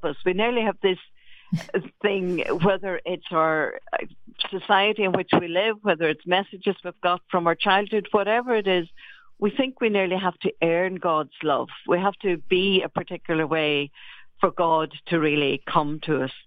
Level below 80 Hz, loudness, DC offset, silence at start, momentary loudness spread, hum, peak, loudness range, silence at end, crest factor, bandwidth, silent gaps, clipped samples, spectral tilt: -62 dBFS; -24 LUFS; under 0.1%; 0 s; 8 LU; none; -4 dBFS; 2 LU; 0.05 s; 20 dB; 7.4 kHz; none; under 0.1%; -7 dB/octave